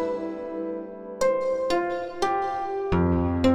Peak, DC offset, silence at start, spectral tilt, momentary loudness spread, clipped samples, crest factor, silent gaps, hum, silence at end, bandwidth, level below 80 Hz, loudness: -8 dBFS; under 0.1%; 0 s; -6.5 dB/octave; 9 LU; under 0.1%; 16 dB; none; none; 0 s; 15 kHz; -44 dBFS; -26 LUFS